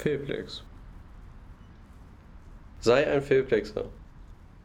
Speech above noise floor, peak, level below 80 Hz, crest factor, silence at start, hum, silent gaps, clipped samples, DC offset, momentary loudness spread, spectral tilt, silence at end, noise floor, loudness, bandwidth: 23 dB; -8 dBFS; -48 dBFS; 22 dB; 0 s; none; none; under 0.1%; under 0.1%; 26 LU; -6 dB/octave; 0.05 s; -49 dBFS; -27 LUFS; 10.5 kHz